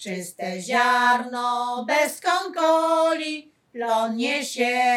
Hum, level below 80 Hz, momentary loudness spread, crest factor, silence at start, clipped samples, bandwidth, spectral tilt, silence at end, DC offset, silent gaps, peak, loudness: none; -84 dBFS; 12 LU; 16 dB; 0 s; under 0.1%; 17.5 kHz; -3 dB/octave; 0 s; under 0.1%; none; -8 dBFS; -22 LUFS